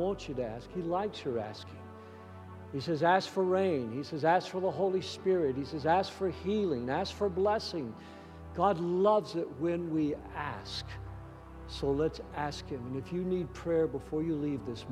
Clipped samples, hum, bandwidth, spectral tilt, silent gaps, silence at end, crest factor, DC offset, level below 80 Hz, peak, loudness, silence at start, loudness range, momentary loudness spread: under 0.1%; none; 12 kHz; -6.5 dB/octave; none; 0 s; 18 dB; under 0.1%; -56 dBFS; -14 dBFS; -32 LUFS; 0 s; 5 LU; 17 LU